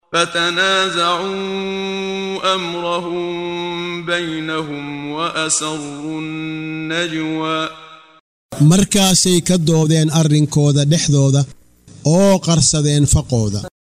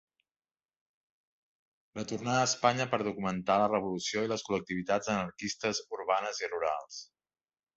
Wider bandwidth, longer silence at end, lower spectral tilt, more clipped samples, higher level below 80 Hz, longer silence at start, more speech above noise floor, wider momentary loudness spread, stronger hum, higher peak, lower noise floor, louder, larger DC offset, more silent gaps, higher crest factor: first, 16 kHz vs 8.2 kHz; second, 0.2 s vs 0.75 s; about the same, -4.5 dB/octave vs -4 dB/octave; neither; first, -38 dBFS vs -68 dBFS; second, 0.1 s vs 1.95 s; second, 23 dB vs over 58 dB; about the same, 12 LU vs 10 LU; neither; first, -2 dBFS vs -10 dBFS; second, -39 dBFS vs under -90 dBFS; first, -16 LUFS vs -32 LUFS; neither; first, 8.20-8.49 s vs none; second, 16 dB vs 22 dB